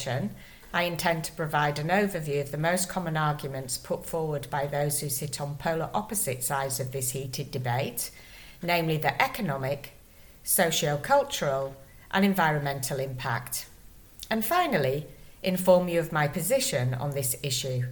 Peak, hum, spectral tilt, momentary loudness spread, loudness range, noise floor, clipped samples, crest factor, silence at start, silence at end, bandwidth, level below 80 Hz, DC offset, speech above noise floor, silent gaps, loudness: -6 dBFS; none; -4 dB/octave; 10 LU; 3 LU; -52 dBFS; under 0.1%; 22 dB; 0 s; 0 s; 19.5 kHz; -54 dBFS; under 0.1%; 24 dB; none; -28 LUFS